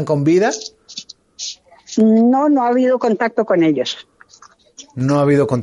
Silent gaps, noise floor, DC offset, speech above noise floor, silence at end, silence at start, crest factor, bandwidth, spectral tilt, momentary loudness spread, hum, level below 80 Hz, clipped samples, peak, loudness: none; -48 dBFS; under 0.1%; 33 dB; 0 s; 0 s; 14 dB; 11 kHz; -6 dB/octave; 18 LU; none; -60 dBFS; under 0.1%; -2 dBFS; -15 LUFS